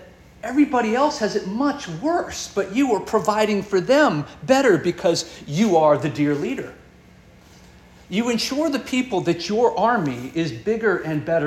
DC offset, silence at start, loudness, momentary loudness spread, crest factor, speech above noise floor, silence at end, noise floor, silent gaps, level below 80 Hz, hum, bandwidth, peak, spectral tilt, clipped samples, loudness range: under 0.1%; 0 s; -21 LUFS; 9 LU; 18 dB; 28 dB; 0 s; -48 dBFS; none; -54 dBFS; none; 14 kHz; -4 dBFS; -5 dB/octave; under 0.1%; 5 LU